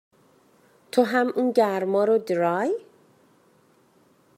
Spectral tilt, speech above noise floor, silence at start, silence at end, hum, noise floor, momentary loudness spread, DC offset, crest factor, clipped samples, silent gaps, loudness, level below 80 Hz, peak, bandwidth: -6 dB/octave; 38 dB; 0.95 s; 1.6 s; none; -60 dBFS; 5 LU; under 0.1%; 20 dB; under 0.1%; none; -23 LUFS; -82 dBFS; -6 dBFS; 15.5 kHz